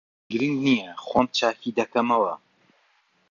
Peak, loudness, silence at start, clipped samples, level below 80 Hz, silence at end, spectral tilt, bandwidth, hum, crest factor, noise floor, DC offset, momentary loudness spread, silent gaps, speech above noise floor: -6 dBFS; -24 LUFS; 0.3 s; under 0.1%; -62 dBFS; 0.95 s; -5 dB/octave; 7.4 kHz; none; 20 dB; -65 dBFS; under 0.1%; 6 LU; none; 42 dB